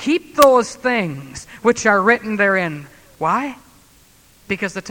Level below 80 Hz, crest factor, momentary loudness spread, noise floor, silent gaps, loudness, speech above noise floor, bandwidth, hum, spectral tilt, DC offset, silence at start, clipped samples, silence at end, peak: -52 dBFS; 18 dB; 15 LU; -51 dBFS; none; -17 LUFS; 33 dB; 19.5 kHz; none; -4.5 dB/octave; under 0.1%; 0 s; under 0.1%; 0 s; 0 dBFS